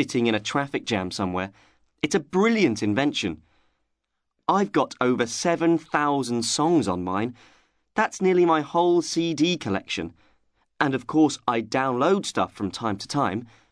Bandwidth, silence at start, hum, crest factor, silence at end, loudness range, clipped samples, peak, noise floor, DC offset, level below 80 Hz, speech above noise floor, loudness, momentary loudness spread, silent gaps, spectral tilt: 11 kHz; 0 s; none; 20 dB; 0.25 s; 2 LU; under 0.1%; -4 dBFS; -78 dBFS; under 0.1%; -62 dBFS; 55 dB; -24 LUFS; 9 LU; none; -4.5 dB/octave